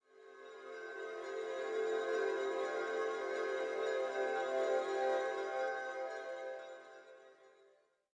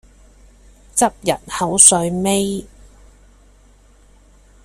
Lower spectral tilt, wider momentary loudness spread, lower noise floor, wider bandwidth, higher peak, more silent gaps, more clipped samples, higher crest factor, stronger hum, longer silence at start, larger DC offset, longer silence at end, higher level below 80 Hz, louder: about the same, -2 dB/octave vs -3 dB/octave; first, 17 LU vs 14 LU; first, -70 dBFS vs -49 dBFS; second, 9.8 kHz vs 16 kHz; second, -24 dBFS vs 0 dBFS; neither; neither; about the same, 16 dB vs 20 dB; neither; second, 0.15 s vs 0.95 s; neither; second, 0.65 s vs 2 s; second, under -90 dBFS vs -46 dBFS; second, -39 LUFS vs -14 LUFS